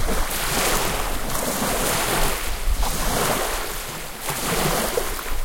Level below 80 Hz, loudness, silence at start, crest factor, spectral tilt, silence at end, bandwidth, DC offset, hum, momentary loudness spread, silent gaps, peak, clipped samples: -28 dBFS; -23 LUFS; 0 s; 16 dB; -2.5 dB/octave; 0 s; 17 kHz; under 0.1%; none; 7 LU; none; -6 dBFS; under 0.1%